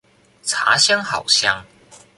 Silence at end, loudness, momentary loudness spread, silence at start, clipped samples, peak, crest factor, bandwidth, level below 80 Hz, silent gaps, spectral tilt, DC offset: 0.2 s; -16 LUFS; 11 LU; 0.45 s; under 0.1%; 0 dBFS; 20 dB; 11.5 kHz; -60 dBFS; none; 0 dB/octave; under 0.1%